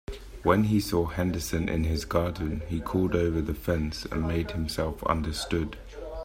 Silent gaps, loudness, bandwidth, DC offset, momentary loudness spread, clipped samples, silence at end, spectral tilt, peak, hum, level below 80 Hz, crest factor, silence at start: none; -28 LUFS; 16 kHz; under 0.1%; 7 LU; under 0.1%; 0 s; -6 dB/octave; -8 dBFS; none; -40 dBFS; 20 dB; 0.1 s